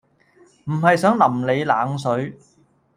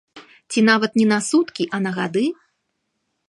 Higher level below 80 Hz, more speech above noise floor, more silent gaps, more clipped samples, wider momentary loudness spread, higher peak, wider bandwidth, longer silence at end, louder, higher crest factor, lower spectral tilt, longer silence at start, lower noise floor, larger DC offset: first, -62 dBFS vs -70 dBFS; second, 36 dB vs 55 dB; neither; neither; first, 12 LU vs 9 LU; about the same, -2 dBFS vs -2 dBFS; first, 15 kHz vs 11.5 kHz; second, 0.6 s vs 1 s; about the same, -19 LUFS vs -19 LUFS; about the same, 18 dB vs 18 dB; first, -6.5 dB/octave vs -4.5 dB/octave; first, 0.65 s vs 0.15 s; second, -55 dBFS vs -74 dBFS; neither